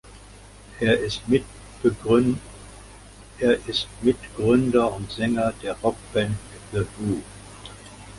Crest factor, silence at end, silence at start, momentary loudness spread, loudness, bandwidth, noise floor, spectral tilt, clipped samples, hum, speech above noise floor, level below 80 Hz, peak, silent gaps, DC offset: 20 dB; 0 s; 0.05 s; 21 LU; -24 LUFS; 11.5 kHz; -45 dBFS; -6 dB/octave; under 0.1%; none; 23 dB; -46 dBFS; -6 dBFS; none; under 0.1%